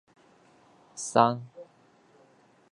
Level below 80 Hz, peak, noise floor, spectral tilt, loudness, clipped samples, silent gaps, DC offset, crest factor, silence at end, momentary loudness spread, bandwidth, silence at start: -76 dBFS; -4 dBFS; -61 dBFS; -4.5 dB/octave; -26 LUFS; under 0.1%; none; under 0.1%; 28 dB; 1.1 s; 25 LU; 11.5 kHz; 0.95 s